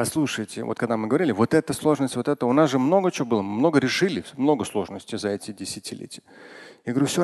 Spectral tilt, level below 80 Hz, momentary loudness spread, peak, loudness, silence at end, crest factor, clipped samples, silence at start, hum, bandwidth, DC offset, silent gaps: -5.5 dB/octave; -60 dBFS; 14 LU; -6 dBFS; -23 LUFS; 0 s; 18 dB; under 0.1%; 0 s; none; 12.5 kHz; under 0.1%; none